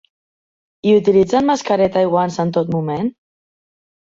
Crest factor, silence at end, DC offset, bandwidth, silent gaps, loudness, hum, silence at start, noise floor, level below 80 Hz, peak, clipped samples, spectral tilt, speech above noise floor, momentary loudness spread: 16 dB; 1.05 s; under 0.1%; 7.8 kHz; none; -16 LUFS; none; 0.85 s; under -90 dBFS; -54 dBFS; -2 dBFS; under 0.1%; -6.5 dB/octave; over 75 dB; 9 LU